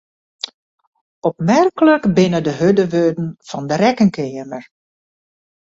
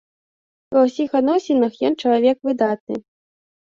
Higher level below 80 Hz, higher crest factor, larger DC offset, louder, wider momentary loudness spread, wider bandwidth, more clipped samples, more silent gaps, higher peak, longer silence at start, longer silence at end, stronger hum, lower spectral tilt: first, -56 dBFS vs -64 dBFS; about the same, 16 dB vs 16 dB; neither; first, -16 LUFS vs -19 LUFS; first, 17 LU vs 7 LU; about the same, 7.8 kHz vs 7.6 kHz; neither; second, none vs 2.80-2.87 s; about the same, -2 dBFS vs -4 dBFS; first, 1.25 s vs 0.7 s; first, 1.15 s vs 0.6 s; neither; about the same, -6.5 dB/octave vs -6 dB/octave